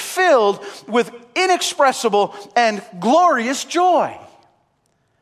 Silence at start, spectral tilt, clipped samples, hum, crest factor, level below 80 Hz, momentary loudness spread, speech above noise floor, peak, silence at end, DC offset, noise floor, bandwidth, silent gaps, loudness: 0 s; -3 dB/octave; under 0.1%; none; 16 dB; -70 dBFS; 7 LU; 48 dB; -2 dBFS; 1.05 s; under 0.1%; -65 dBFS; 15 kHz; none; -17 LUFS